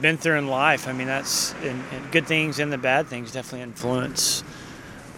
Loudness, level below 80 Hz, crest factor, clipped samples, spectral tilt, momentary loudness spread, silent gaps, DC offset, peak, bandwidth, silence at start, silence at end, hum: -23 LUFS; -56 dBFS; 22 dB; under 0.1%; -3 dB/octave; 14 LU; none; under 0.1%; -2 dBFS; 17 kHz; 0 s; 0 s; none